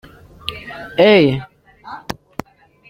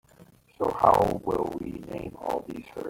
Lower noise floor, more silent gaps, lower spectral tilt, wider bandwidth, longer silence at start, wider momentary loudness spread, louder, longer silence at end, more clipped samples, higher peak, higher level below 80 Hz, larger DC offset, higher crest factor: second, -36 dBFS vs -56 dBFS; neither; about the same, -6.5 dB/octave vs -7 dB/octave; about the same, 16.5 kHz vs 17 kHz; first, 0.45 s vs 0.2 s; first, 22 LU vs 16 LU; first, -14 LUFS vs -27 LUFS; first, 0.9 s vs 0 s; neither; about the same, -2 dBFS vs -4 dBFS; about the same, -50 dBFS vs -52 dBFS; neither; second, 18 dB vs 24 dB